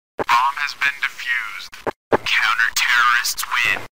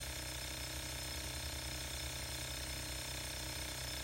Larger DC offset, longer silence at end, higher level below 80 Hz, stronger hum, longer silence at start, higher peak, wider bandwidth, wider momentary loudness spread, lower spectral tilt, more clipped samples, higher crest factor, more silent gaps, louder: first, 0.8% vs under 0.1%; about the same, 0.05 s vs 0 s; about the same, -54 dBFS vs -50 dBFS; neither; first, 0.15 s vs 0 s; first, -4 dBFS vs -30 dBFS; about the same, 16.5 kHz vs 16 kHz; first, 11 LU vs 1 LU; second, -0.5 dB/octave vs -2 dB/octave; neither; about the same, 16 dB vs 14 dB; first, 1.96-2.11 s vs none; first, -18 LUFS vs -42 LUFS